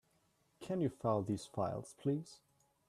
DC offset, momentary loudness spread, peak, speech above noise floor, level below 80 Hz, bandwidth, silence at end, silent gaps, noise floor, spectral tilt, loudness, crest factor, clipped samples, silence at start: under 0.1%; 8 LU; -22 dBFS; 38 dB; -72 dBFS; 13.5 kHz; 0.5 s; none; -76 dBFS; -7.5 dB/octave; -39 LUFS; 20 dB; under 0.1%; 0.6 s